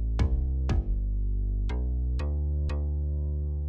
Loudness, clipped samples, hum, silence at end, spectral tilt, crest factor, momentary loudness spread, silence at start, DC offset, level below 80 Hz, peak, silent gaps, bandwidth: -30 LUFS; under 0.1%; none; 0 s; -8.5 dB/octave; 14 dB; 3 LU; 0 s; under 0.1%; -28 dBFS; -14 dBFS; none; 7 kHz